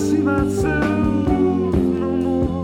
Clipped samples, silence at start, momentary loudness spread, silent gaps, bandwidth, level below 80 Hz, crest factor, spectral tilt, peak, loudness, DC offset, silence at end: under 0.1%; 0 s; 2 LU; none; 15.5 kHz; -32 dBFS; 12 dB; -7.5 dB/octave; -6 dBFS; -19 LUFS; under 0.1%; 0 s